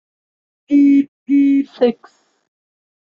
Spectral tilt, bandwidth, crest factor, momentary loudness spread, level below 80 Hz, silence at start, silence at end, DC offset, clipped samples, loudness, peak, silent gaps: -7 dB/octave; 4.9 kHz; 14 dB; 6 LU; -66 dBFS; 0.7 s; 1.1 s; under 0.1%; under 0.1%; -15 LUFS; -2 dBFS; 1.08-1.26 s